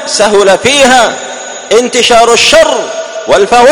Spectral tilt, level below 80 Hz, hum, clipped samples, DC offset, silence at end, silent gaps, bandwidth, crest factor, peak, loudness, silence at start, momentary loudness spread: -1.5 dB/octave; -38 dBFS; none; 5%; under 0.1%; 0 s; none; over 20 kHz; 6 dB; 0 dBFS; -6 LUFS; 0 s; 14 LU